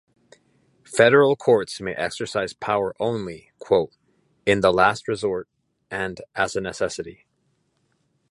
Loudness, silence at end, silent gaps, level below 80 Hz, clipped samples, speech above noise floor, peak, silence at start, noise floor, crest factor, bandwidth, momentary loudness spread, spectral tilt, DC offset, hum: -22 LUFS; 1.2 s; none; -56 dBFS; under 0.1%; 48 dB; -2 dBFS; 0.9 s; -69 dBFS; 22 dB; 11.5 kHz; 15 LU; -4.5 dB/octave; under 0.1%; none